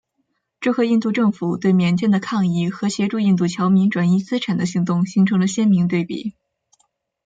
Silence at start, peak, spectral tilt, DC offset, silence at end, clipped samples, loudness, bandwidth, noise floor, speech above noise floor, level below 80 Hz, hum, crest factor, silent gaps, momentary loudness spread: 0.6 s; -6 dBFS; -6.5 dB/octave; under 0.1%; 0.95 s; under 0.1%; -19 LUFS; 8.8 kHz; -71 dBFS; 54 dB; -62 dBFS; none; 12 dB; none; 6 LU